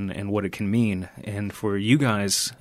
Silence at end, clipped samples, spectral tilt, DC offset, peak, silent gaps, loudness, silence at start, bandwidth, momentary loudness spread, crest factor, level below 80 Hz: 0.05 s; under 0.1%; -4.5 dB/octave; under 0.1%; -6 dBFS; none; -24 LUFS; 0 s; 15.5 kHz; 11 LU; 18 dB; -58 dBFS